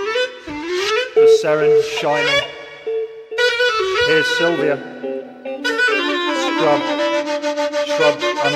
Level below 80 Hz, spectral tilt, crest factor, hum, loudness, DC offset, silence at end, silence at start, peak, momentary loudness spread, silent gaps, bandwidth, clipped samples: -56 dBFS; -3 dB/octave; 14 dB; none; -17 LUFS; under 0.1%; 0 s; 0 s; -2 dBFS; 12 LU; none; 13.5 kHz; under 0.1%